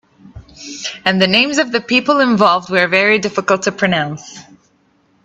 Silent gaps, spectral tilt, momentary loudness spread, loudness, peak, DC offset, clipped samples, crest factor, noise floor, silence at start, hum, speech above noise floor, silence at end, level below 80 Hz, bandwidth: none; -4 dB/octave; 14 LU; -14 LUFS; 0 dBFS; under 0.1%; under 0.1%; 16 dB; -57 dBFS; 0.35 s; none; 42 dB; 0.85 s; -54 dBFS; 8.4 kHz